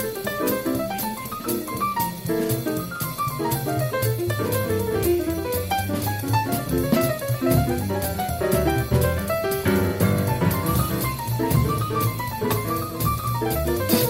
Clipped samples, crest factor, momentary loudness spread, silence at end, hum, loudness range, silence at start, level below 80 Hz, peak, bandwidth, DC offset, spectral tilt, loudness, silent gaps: under 0.1%; 18 dB; 5 LU; 0 s; none; 3 LU; 0 s; -40 dBFS; -6 dBFS; 16.5 kHz; under 0.1%; -5.5 dB/octave; -23 LUFS; none